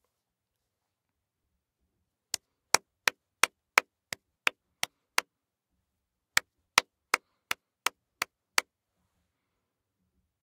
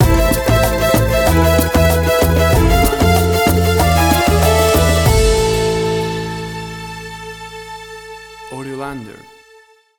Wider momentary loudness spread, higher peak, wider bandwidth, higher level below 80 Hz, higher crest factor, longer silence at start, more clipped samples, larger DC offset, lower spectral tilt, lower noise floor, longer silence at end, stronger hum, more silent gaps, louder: second, 11 LU vs 18 LU; about the same, -2 dBFS vs 0 dBFS; second, 16 kHz vs over 20 kHz; second, -80 dBFS vs -22 dBFS; first, 34 dB vs 14 dB; first, 2.75 s vs 0 s; neither; neither; second, 1 dB/octave vs -5 dB/octave; first, -85 dBFS vs -47 dBFS; first, 1.8 s vs 0.9 s; neither; neither; second, -31 LUFS vs -13 LUFS